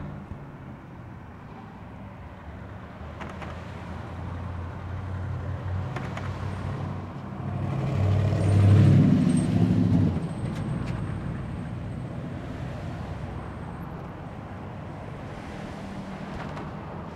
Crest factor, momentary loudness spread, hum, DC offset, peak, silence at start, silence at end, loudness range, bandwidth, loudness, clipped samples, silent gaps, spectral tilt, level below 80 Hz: 20 dB; 20 LU; none; under 0.1%; -8 dBFS; 0 s; 0 s; 17 LU; 9.2 kHz; -28 LUFS; under 0.1%; none; -8.5 dB/octave; -46 dBFS